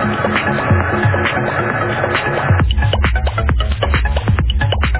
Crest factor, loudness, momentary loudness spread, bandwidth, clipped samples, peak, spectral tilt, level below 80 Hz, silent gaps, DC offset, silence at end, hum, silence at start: 14 dB; -16 LUFS; 2 LU; 4 kHz; under 0.1%; -2 dBFS; -10 dB/octave; -20 dBFS; none; 0.3%; 0 s; none; 0 s